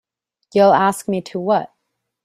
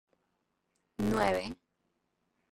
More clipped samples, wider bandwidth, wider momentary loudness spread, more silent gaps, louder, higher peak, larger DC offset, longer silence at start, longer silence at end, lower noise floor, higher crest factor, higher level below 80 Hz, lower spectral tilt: neither; about the same, 15 kHz vs 16 kHz; second, 11 LU vs 20 LU; neither; first, -17 LUFS vs -32 LUFS; first, -2 dBFS vs -14 dBFS; neither; second, 0.55 s vs 1 s; second, 0.6 s vs 1 s; second, -75 dBFS vs -80 dBFS; second, 16 dB vs 22 dB; second, -64 dBFS vs -56 dBFS; about the same, -5.5 dB/octave vs -5.5 dB/octave